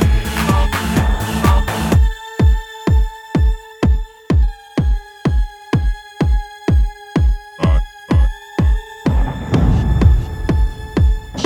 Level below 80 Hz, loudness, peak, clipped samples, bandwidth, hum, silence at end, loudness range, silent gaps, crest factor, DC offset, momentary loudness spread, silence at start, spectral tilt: -18 dBFS; -17 LUFS; 0 dBFS; under 0.1%; 17 kHz; none; 0 s; 3 LU; none; 14 dB; under 0.1%; 5 LU; 0 s; -6.5 dB/octave